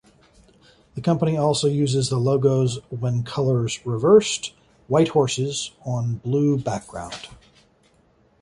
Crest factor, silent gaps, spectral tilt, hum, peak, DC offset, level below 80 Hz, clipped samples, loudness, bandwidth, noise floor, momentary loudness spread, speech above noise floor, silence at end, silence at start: 18 dB; none; -6 dB/octave; none; -4 dBFS; under 0.1%; -54 dBFS; under 0.1%; -22 LUFS; 11.5 kHz; -59 dBFS; 15 LU; 38 dB; 1.1 s; 0.95 s